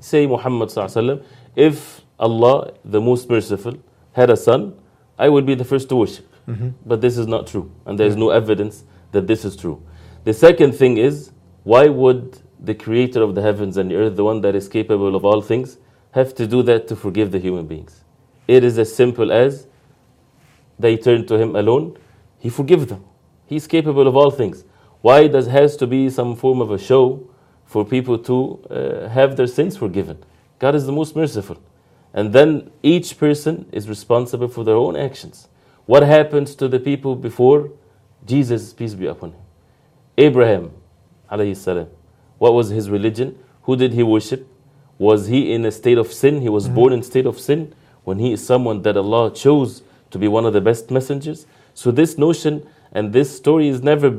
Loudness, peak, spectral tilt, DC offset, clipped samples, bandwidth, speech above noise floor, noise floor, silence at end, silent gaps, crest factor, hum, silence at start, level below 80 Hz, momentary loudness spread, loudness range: -16 LUFS; 0 dBFS; -7 dB/octave; under 0.1%; under 0.1%; 15 kHz; 38 dB; -54 dBFS; 0 s; none; 16 dB; none; 0.05 s; -56 dBFS; 15 LU; 5 LU